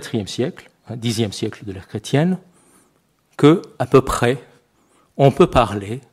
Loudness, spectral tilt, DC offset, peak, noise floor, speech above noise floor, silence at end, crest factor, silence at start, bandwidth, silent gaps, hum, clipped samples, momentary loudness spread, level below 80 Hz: -18 LUFS; -6.5 dB/octave; under 0.1%; 0 dBFS; -61 dBFS; 43 dB; 0.15 s; 20 dB; 0 s; 15 kHz; none; none; under 0.1%; 16 LU; -42 dBFS